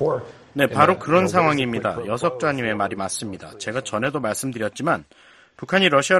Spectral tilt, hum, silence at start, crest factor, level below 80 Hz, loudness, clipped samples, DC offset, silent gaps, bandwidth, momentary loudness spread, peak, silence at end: -4.5 dB/octave; none; 0 s; 20 dB; -56 dBFS; -21 LUFS; under 0.1%; under 0.1%; none; 13 kHz; 12 LU; 0 dBFS; 0 s